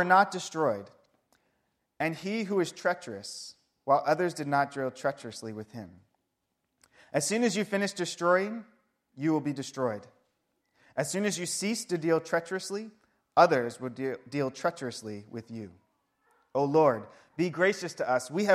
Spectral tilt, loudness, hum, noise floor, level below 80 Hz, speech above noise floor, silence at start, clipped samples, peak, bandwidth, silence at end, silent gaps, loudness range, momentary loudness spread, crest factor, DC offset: -4.5 dB/octave; -30 LUFS; none; -81 dBFS; -76 dBFS; 52 dB; 0 s; under 0.1%; -8 dBFS; 15 kHz; 0 s; none; 4 LU; 18 LU; 24 dB; under 0.1%